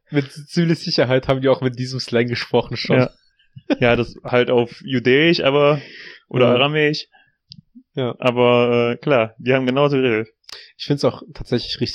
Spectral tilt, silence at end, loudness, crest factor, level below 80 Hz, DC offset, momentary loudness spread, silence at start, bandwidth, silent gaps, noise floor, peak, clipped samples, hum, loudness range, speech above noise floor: -6.5 dB/octave; 0 s; -18 LUFS; 18 dB; -48 dBFS; under 0.1%; 11 LU; 0.1 s; 11 kHz; none; -47 dBFS; -2 dBFS; under 0.1%; none; 2 LU; 29 dB